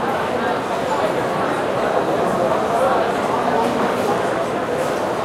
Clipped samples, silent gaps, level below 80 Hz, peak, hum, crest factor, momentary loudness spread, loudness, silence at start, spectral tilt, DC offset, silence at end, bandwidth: under 0.1%; none; -52 dBFS; -4 dBFS; none; 16 dB; 3 LU; -19 LUFS; 0 s; -5 dB/octave; under 0.1%; 0 s; 16.5 kHz